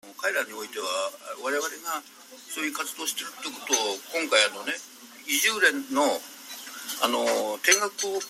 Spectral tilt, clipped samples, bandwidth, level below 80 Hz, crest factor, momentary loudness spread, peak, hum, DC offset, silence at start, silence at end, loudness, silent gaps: 0.5 dB/octave; under 0.1%; 16 kHz; -82 dBFS; 24 dB; 15 LU; -4 dBFS; none; under 0.1%; 0.05 s; 0 s; -26 LUFS; none